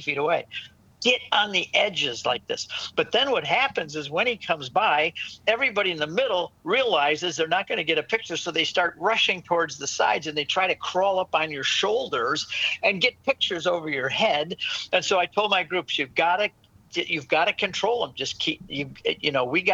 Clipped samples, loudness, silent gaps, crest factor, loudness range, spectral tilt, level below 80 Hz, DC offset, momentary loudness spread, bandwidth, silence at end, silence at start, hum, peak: under 0.1%; -24 LUFS; none; 20 dB; 1 LU; -2.5 dB/octave; -66 dBFS; under 0.1%; 6 LU; 8.4 kHz; 0 s; 0 s; none; -4 dBFS